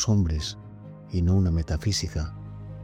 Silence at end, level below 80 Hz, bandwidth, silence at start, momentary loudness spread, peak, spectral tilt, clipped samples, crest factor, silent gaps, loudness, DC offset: 0 s; -38 dBFS; 11 kHz; 0 s; 18 LU; -12 dBFS; -5.5 dB/octave; under 0.1%; 14 dB; none; -26 LUFS; under 0.1%